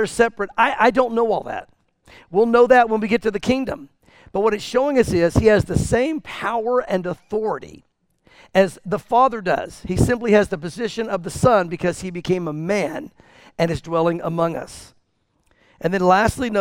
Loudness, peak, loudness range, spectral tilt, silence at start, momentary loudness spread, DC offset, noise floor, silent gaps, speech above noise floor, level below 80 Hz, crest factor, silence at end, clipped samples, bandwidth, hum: -19 LUFS; -2 dBFS; 5 LU; -6 dB/octave; 0 s; 11 LU; under 0.1%; -66 dBFS; none; 47 dB; -40 dBFS; 18 dB; 0 s; under 0.1%; 16.5 kHz; none